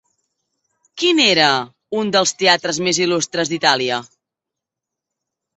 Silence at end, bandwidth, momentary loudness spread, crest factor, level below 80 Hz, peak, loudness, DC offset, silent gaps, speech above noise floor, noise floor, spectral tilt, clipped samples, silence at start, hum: 1.55 s; 8.4 kHz; 10 LU; 18 dB; -64 dBFS; 0 dBFS; -16 LUFS; under 0.1%; none; 67 dB; -84 dBFS; -2.5 dB/octave; under 0.1%; 0.95 s; none